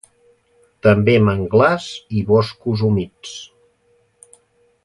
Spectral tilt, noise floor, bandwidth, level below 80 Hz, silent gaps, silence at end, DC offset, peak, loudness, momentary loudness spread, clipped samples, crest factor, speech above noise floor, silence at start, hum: -7 dB/octave; -60 dBFS; 11.5 kHz; -44 dBFS; none; 1.4 s; under 0.1%; 0 dBFS; -17 LUFS; 17 LU; under 0.1%; 18 dB; 44 dB; 0.85 s; none